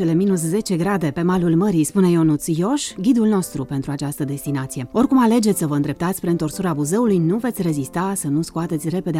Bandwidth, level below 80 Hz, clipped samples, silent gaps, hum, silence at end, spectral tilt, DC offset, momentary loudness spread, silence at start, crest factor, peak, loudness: 16.5 kHz; -48 dBFS; under 0.1%; none; none; 0 s; -6.5 dB/octave; under 0.1%; 9 LU; 0 s; 14 dB; -6 dBFS; -20 LUFS